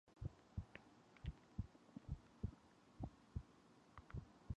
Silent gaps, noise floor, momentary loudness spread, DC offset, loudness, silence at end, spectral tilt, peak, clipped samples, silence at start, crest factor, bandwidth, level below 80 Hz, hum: none; -69 dBFS; 14 LU; under 0.1%; -56 LUFS; 0 s; -7.5 dB/octave; -32 dBFS; under 0.1%; 0.05 s; 22 dB; 9.6 kHz; -58 dBFS; none